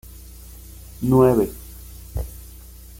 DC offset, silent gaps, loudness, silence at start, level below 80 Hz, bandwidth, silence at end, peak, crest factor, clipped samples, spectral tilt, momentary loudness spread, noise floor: under 0.1%; none; -20 LUFS; 0.5 s; -38 dBFS; 17 kHz; 0.4 s; -2 dBFS; 20 dB; under 0.1%; -8 dB/octave; 26 LU; -41 dBFS